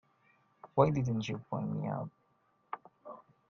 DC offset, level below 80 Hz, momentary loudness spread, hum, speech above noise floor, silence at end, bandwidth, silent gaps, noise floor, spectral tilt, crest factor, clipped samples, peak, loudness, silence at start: under 0.1%; -66 dBFS; 23 LU; none; 41 dB; 0.3 s; 7.2 kHz; none; -73 dBFS; -8 dB/octave; 26 dB; under 0.1%; -10 dBFS; -34 LUFS; 0.65 s